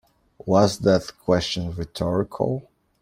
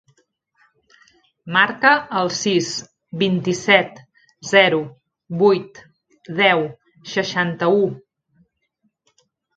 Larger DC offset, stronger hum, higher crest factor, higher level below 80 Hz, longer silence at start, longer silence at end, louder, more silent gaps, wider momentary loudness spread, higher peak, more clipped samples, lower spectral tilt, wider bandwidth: neither; neither; about the same, 20 dB vs 20 dB; first, -48 dBFS vs -64 dBFS; second, 0.45 s vs 1.45 s; second, 0.4 s vs 1.6 s; second, -23 LUFS vs -18 LUFS; neither; second, 11 LU vs 16 LU; second, -4 dBFS vs 0 dBFS; neither; first, -6 dB/octave vs -4 dB/octave; first, 15.5 kHz vs 9 kHz